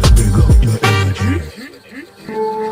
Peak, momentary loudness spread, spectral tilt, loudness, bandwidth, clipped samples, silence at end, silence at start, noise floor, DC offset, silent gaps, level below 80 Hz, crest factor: 0 dBFS; 22 LU; -5.5 dB/octave; -14 LUFS; 16 kHz; under 0.1%; 0 s; 0 s; -35 dBFS; under 0.1%; none; -16 dBFS; 14 dB